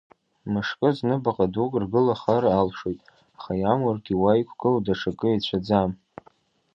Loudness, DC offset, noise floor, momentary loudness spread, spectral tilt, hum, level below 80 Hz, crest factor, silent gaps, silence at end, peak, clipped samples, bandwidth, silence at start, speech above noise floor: -24 LUFS; under 0.1%; -60 dBFS; 10 LU; -8 dB/octave; none; -52 dBFS; 18 dB; none; 0.8 s; -6 dBFS; under 0.1%; 7.2 kHz; 0.45 s; 37 dB